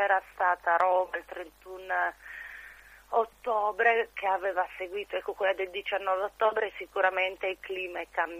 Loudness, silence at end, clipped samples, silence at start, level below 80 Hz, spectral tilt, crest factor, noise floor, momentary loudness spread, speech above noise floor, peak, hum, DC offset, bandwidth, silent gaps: -29 LUFS; 0 s; under 0.1%; 0 s; -64 dBFS; -3 dB/octave; 22 dB; -51 dBFS; 17 LU; 22 dB; -8 dBFS; 50 Hz at -65 dBFS; under 0.1%; 15.5 kHz; none